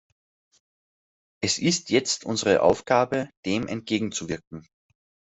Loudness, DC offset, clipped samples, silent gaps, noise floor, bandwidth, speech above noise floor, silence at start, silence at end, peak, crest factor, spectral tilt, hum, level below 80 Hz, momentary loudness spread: -24 LUFS; under 0.1%; under 0.1%; 3.37-3.43 s, 4.47-4.51 s; under -90 dBFS; 8.2 kHz; over 66 dB; 1.4 s; 0.7 s; -6 dBFS; 22 dB; -3.5 dB/octave; none; -60 dBFS; 12 LU